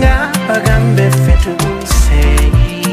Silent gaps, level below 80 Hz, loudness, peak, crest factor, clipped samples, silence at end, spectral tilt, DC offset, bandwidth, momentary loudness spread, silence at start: none; -12 dBFS; -12 LUFS; 0 dBFS; 10 dB; under 0.1%; 0 s; -5.5 dB/octave; under 0.1%; 15.5 kHz; 4 LU; 0 s